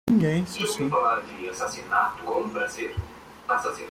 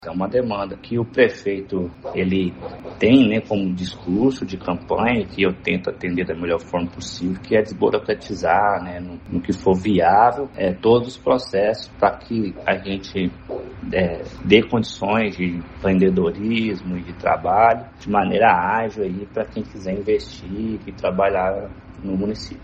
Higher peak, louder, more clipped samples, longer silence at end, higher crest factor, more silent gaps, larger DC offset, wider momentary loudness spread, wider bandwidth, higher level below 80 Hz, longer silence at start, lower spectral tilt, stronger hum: second, -8 dBFS vs 0 dBFS; second, -26 LUFS vs -20 LUFS; neither; about the same, 0 s vs 0 s; about the same, 18 dB vs 20 dB; neither; neither; about the same, 11 LU vs 12 LU; first, 16.5 kHz vs 8.4 kHz; second, -52 dBFS vs -46 dBFS; about the same, 0.05 s vs 0 s; second, -5 dB/octave vs -6.5 dB/octave; neither